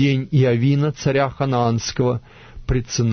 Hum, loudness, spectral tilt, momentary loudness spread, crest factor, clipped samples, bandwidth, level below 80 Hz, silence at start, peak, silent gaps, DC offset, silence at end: none; -20 LUFS; -6 dB/octave; 7 LU; 14 dB; under 0.1%; 6.6 kHz; -36 dBFS; 0 s; -6 dBFS; none; under 0.1%; 0 s